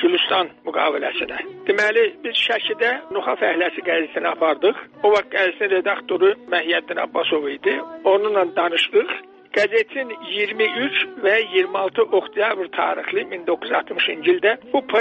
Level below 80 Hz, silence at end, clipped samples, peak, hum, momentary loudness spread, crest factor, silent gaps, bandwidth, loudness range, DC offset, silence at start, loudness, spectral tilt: -68 dBFS; 0 s; under 0.1%; -6 dBFS; none; 7 LU; 14 dB; none; 8.4 kHz; 1 LU; under 0.1%; 0 s; -20 LUFS; -4 dB/octave